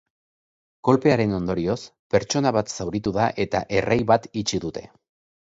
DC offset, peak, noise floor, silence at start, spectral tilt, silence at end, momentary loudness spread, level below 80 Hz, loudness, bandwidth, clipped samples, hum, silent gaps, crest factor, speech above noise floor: under 0.1%; -4 dBFS; under -90 dBFS; 0.85 s; -5.5 dB/octave; 0.55 s; 8 LU; -50 dBFS; -23 LUFS; 8 kHz; under 0.1%; none; 1.99-2.10 s; 20 dB; over 68 dB